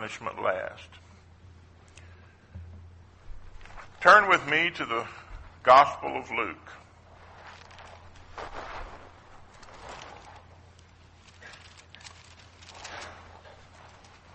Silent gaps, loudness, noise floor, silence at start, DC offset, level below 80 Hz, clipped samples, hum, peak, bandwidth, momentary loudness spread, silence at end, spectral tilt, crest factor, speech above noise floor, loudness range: none; -23 LUFS; -55 dBFS; 0 s; under 0.1%; -54 dBFS; under 0.1%; none; -4 dBFS; 8.4 kHz; 30 LU; 1.2 s; -3.5 dB/octave; 26 dB; 31 dB; 24 LU